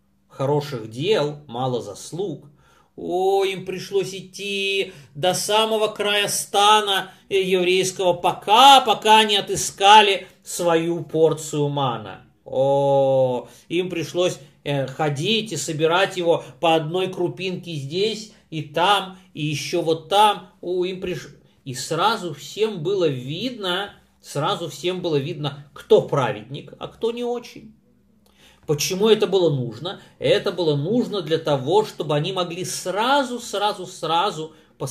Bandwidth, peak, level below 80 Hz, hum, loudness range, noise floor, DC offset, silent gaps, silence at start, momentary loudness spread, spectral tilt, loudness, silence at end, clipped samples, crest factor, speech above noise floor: 15.5 kHz; 0 dBFS; -62 dBFS; none; 9 LU; -58 dBFS; under 0.1%; none; 0.35 s; 14 LU; -4 dB/octave; -21 LUFS; 0 s; under 0.1%; 22 dB; 37 dB